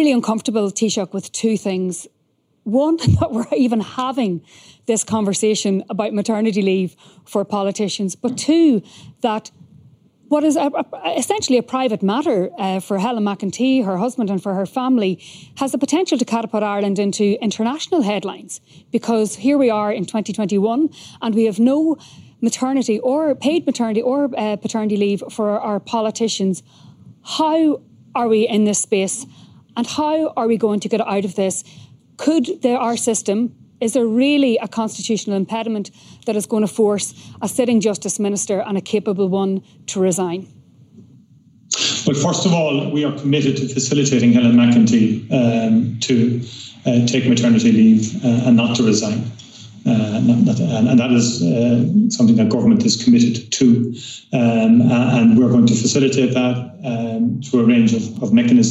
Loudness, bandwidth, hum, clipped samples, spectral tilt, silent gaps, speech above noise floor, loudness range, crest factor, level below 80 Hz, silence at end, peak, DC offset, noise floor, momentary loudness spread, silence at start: -17 LUFS; 13.5 kHz; none; under 0.1%; -5.5 dB/octave; none; 47 dB; 5 LU; 14 dB; -56 dBFS; 0 s; -4 dBFS; under 0.1%; -63 dBFS; 10 LU; 0 s